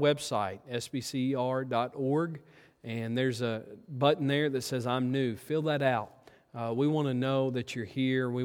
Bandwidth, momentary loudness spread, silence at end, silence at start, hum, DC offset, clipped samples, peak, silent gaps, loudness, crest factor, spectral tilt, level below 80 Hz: 16.5 kHz; 10 LU; 0 s; 0 s; none; under 0.1%; under 0.1%; -12 dBFS; none; -31 LUFS; 20 dB; -6 dB/octave; -72 dBFS